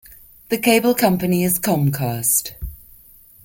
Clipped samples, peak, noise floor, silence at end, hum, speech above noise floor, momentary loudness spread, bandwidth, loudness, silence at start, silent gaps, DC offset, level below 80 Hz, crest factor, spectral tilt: under 0.1%; -2 dBFS; -47 dBFS; 0.7 s; none; 30 dB; 14 LU; 17 kHz; -18 LUFS; 0.1 s; none; under 0.1%; -42 dBFS; 18 dB; -4.5 dB/octave